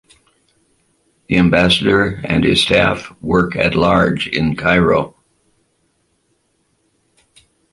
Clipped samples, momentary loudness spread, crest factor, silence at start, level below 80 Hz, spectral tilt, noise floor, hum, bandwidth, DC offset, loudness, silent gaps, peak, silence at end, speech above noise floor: under 0.1%; 6 LU; 16 dB; 1.3 s; -38 dBFS; -5.5 dB/octave; -63 dBFS; none; 11.5 kHz; under 0.1%; -14 LUFS; none; 0 dBFS; 2.65 s; 49 dB